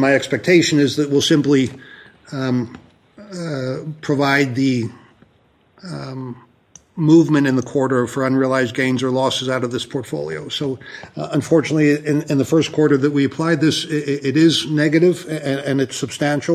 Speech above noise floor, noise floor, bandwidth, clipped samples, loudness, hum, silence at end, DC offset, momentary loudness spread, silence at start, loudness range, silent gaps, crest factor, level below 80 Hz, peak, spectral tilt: 39 dB; -57 dBFS; 15 kHz; under 0.1%; -18 LUFS; none; 0 s; under 0.1%; 15 LU; 0 s; 5 LU; none; 16 dB; -58 dBFS; -2 dBFS; -5.5 dB/octave